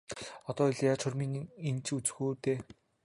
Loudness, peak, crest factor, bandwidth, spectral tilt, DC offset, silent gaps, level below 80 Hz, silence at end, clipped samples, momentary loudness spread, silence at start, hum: -34 LUFS; -16 dBFS; 18 dB; 11.5 kHz; -5.5 dB/octave; under 0.1%; none; -68 dBFS; 0.4 s; under 0.1%; 12 LU; 0.1 s; none